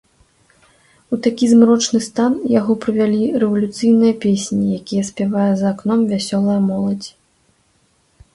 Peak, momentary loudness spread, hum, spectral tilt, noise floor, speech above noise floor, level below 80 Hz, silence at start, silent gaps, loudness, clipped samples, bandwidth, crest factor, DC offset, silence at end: 0 dBFS; 8 LU; none; -6 dB/octave; -59 dBFS; 44 dB; -56 dBFS; 1.1 s; none; -16 LUFS; under 0.1%; 11.5 kHz; 16 dB; under 0.1%; 1.25 s